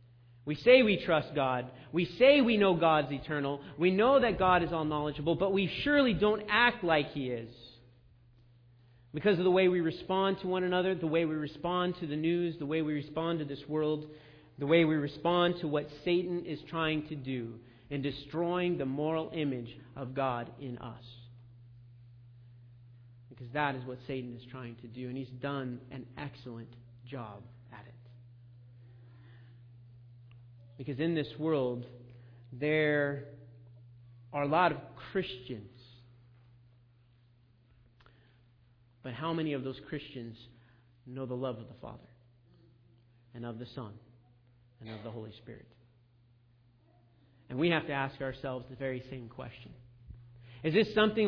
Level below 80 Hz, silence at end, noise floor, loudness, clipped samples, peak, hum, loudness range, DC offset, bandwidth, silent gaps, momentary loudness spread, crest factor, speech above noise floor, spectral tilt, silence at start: -62 dBFS; 0 s; -65 dBFS; -31 LUFS; under 0.1%; -10 dBFS; none; 20 LU; under 0.1%; 5.4 kHz; none; 21 LU; 24 dB; 34 dB; -8.5 dB/octave; 0.45 s